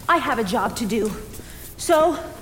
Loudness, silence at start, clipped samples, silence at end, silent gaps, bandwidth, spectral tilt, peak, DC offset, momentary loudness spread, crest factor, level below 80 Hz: -21 LUFS; 0 s; under 0.1%; 0 s; none; 17 kHz; -4 dB/octave; -6 dBFS; under 0.1%; 19 LU; 16 dB; -44 dBFS